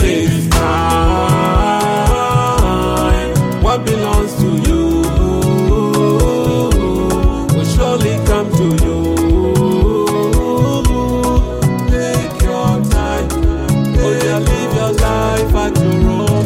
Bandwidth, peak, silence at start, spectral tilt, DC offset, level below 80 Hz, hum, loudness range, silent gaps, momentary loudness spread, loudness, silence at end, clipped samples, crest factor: 16.5 kHz; 0 dBFS; 0 s; -6 dB/octave; under 0.1%; -18 dBFS; none; 1 LU; none; 3 LU; -14 LUFS; 0 s; under 0.1%; 12 dB